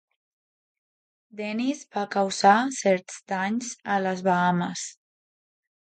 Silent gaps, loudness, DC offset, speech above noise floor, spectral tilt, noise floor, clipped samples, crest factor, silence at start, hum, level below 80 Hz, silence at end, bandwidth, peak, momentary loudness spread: none; -25 LUFS; under 0.1%; over 65 dB; -4.5 dB/octave; under -90 dBFS; under 0.1%; 20 dB; 1.35 s; none; -76 dBFS; 0.9 s; 9.4 kHz; -6 dBFS; 13 LU